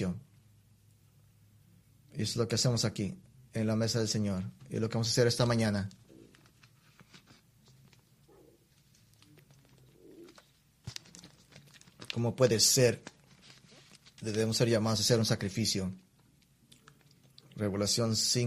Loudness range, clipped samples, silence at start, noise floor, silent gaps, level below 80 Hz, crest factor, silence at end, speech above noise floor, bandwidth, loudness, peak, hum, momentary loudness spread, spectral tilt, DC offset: 13 LU; under 0.1%; 0 s; -66 dBFS; none; -64 dBFS; 22 dB; 0 s; 36 dB; 15 kHz; -30 LUFS; -12 dBFS; none; 19 LU; -4 dB/octave; under 0.1%